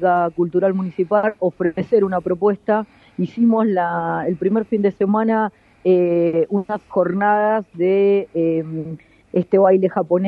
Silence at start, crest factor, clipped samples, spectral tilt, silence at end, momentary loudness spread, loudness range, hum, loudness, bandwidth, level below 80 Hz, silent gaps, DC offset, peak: 0 s; 16 dB; under 0.1%; -10 dB/octave; 0 s; 8 LU; 1 LU; none; -18 LUFS; 4.8 kHz; -60 dBFS; none; under 0.1%; -2 dBFS